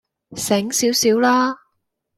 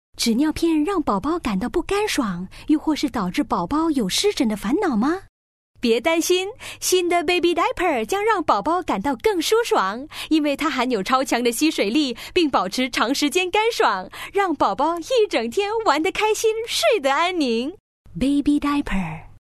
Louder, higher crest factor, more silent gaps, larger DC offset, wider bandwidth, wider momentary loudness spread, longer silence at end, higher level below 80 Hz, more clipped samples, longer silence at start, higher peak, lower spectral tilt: first, -18 LUFS vs -21 LUFS; about the same, 16 dB vs 18 dB; second, none vs 5.29-5.74 s, 17.80-18.04 s; neither; first, 16 kHz vs 13 kHz; first, 16 LU vs 5 LU; first, 0.6 s vs 0.2 s; second, -60 dBFS vs -44 dBFS; neither; first, 0.3 s vs 0.15 s; about the same, -4 dBFS vs -4 dBFS; about the same, -3 dB/octave vs -3.5 dB/octave